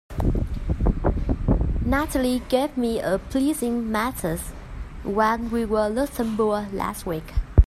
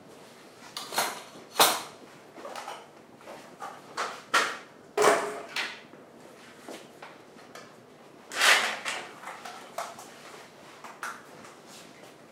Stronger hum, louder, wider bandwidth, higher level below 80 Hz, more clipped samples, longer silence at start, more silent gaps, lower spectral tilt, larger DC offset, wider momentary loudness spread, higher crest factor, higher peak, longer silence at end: neither; first, -24 LUFS vs -28 LUFS; second, 14.5 kHz vs 16 kHz; first, -28 dBFS vs -82 dBFS; neither; about the same, 0.1 s vs 0 s; neither; first, -6.5 dB/octave vs -0.5 dB/octave; neither; second, 7 LU vs 26 LU; second, 22 dB vs 28 dB; first, 0 dBFS vs -4 dBFS; about the same, 0 s vs 0.05 s